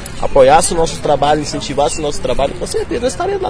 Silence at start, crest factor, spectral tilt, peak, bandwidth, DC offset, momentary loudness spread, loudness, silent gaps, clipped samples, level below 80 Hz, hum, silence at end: 0 s; 14 dB; -4 dB/octave; 0 dBFS; 11 kHz; under 0.1%; 10 LU; -14 LUFS; none; under 0.1%; -28 dBFS; none; 0 s